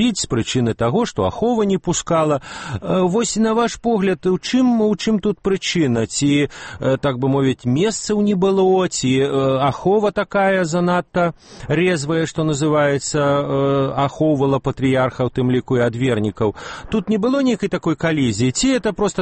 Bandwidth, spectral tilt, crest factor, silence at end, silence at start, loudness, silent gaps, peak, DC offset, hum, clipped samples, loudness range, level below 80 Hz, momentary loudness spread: 8.8 kHz; -5.5 dB/octave; 12 dB; 0 s; 0 s; -18 LUFS; none; -6 dBFS; under 0.1%; none; under 0.1%; 2 LU; -44 dBFS; 4 LU